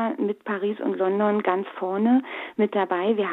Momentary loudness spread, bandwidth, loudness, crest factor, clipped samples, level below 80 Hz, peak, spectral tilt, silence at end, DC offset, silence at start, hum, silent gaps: 6 LU; 4.1 kHz; -24 LUFS; 16 dB; under 0.1%; -78 dBFS; -6 dBFS; -9 dB/octave; 0 s; under 0.1%; 0 s; none; none